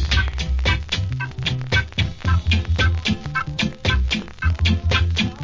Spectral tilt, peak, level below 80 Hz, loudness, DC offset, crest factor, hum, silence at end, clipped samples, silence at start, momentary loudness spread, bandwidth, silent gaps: -5 dB/octave; -4 dBFS; -24 dBFS; -21 LUFS; under 0.1%; 16 dB; none; 0 s; under 0.1%; 0 s; 5 LU; 7.6 kHz; none